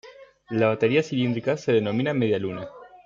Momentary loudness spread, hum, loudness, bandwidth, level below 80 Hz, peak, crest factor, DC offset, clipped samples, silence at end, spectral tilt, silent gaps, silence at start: 10 LU; none; -24 LUFS; 7.6 kHz; -66 dBFS; -8 dBFS; 16 dB; under 0.1%; under 0.1%; 0.1 s; -7 dB/octave; none; 0.05 s